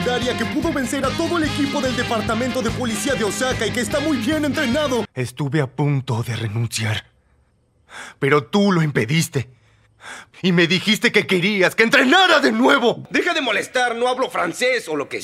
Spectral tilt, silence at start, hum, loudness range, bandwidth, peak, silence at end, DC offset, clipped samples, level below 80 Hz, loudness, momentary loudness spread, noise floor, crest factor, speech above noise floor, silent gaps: -4.5 dB/octave; 0 s; none; 7 LU; 16 kHz; 0 dBFS; 0 s; under 0.1%; under 0.1%; -46 dBFS; -19 LUFS; 10 LU; -60 dBFS; 20 dB; 41 dB; none